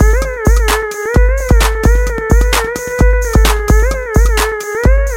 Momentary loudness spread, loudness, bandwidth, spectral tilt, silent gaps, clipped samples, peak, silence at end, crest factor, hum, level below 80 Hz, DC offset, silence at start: 3 LU; -13 LUFS; 16.5 kHz; -5 dB/octave; none; under 0.1%; 0 dBFS; 0 s; 10 dB; none; -12 dBFS; under 0.1%; 0 s